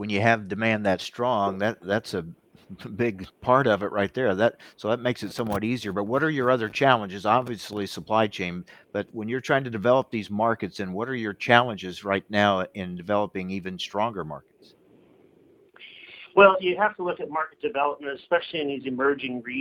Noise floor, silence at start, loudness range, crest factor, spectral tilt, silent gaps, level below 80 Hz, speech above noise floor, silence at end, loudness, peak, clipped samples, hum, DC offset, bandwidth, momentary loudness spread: -57 dBFS; 0 s; 4 LU; 24 dB; -6 dB/octave; none; -64 dBFS; 32 dB; 0 s; -25 LUFS; 0 dBFS; under 0.1%; none; under 0.1%; 18 kHz; 12 LU